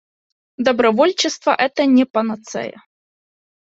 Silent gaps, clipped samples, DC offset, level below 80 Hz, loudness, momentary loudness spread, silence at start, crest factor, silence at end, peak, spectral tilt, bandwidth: 2.10-2.14 s; under 0.1%; under 0.1%; -64 dBFS; -17 LUFS; 13 LU; 0.6 s; 18 dB; 1 s; -2 dBFS; -3.5 dB/octave; 8 kHz